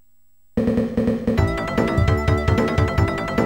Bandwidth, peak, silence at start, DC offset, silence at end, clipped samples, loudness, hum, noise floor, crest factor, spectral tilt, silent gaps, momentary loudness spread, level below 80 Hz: 16.5 kHz; -4 dBFS; 0.55 s; 0.3%; 0 s; under 0.1%; -20 LUFS; none; -64 dBFS; 16 dB; -7.5 dB/octave; none; 3 LU; -30 dBFS